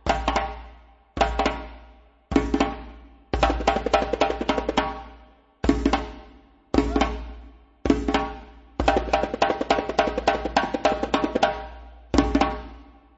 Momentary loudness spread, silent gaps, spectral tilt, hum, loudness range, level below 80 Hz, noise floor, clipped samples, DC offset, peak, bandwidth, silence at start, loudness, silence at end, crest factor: 16 LU; none; -5.5 dB/octave; none; 3 LU; -34 dBFS; -52 dBFS; under 0.1%; under 0.1%; -4 dBFS; 8 kHz; 0.05 s; -24 LUFS; 0.35 s; 22 dB